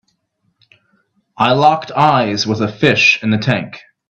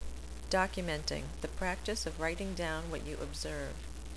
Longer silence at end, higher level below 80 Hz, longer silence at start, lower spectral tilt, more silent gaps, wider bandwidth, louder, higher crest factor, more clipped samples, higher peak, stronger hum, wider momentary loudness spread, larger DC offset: first, 0.3 s vs 0 s; second, -52 dBFS vs -44 dBFS; first, 1.4 s vs 0 s; about the same, -5 dB/octave vs -4 dB/octave; neither; second, 8.4 kHz vs 11 kHz; first, -13 LUFS vs -37 LUFS; about the same, 16 dB vs 20 dB; neither; first, 0 dBFS vs -18 dBFS; neither; about the same, 8 LU vs 10 LU; second, under 0.1% vs 0.4%